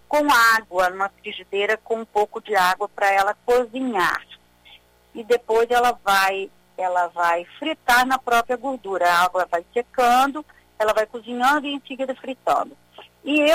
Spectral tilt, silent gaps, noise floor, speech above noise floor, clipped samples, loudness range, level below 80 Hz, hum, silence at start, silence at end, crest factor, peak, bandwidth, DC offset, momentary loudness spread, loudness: -2.5 dB/octave; none; -51 dBFS; 31 dB; under 0.1%; 2 LU; -56 dBFS; 60 Hz at -65 dBFS; 0.1 s; 0 s; 14 dB; -6 dBFS; 16 kHz; under 0.1%; 11 LU; -21 LUFS